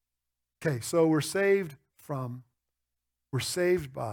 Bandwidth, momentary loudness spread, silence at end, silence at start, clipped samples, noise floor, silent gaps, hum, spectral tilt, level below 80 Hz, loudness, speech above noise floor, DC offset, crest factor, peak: 19.5 kHz; 14 LU; 0 s; 0.6 s; under 0.1%; -86 dBFS; none; 60 Hz at -60 dBFS; -5 dB/octave; -64 dBFS; -29 LUFS; 58 dB; under 0.1%; 16 dB; -14 dBFS